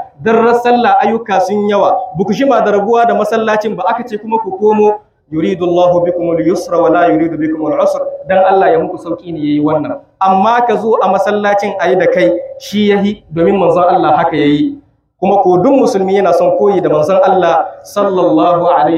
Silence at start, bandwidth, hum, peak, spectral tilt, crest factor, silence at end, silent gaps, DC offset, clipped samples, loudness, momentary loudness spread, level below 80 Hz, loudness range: 0 s; 14 kHz; none; 0 dBFS; -6.5 dB/octave; 10 dB; 0 s; none; under 0.1%; under 0.1%; -11 LUFS; 7 LU; -52 dBFS; 2 LU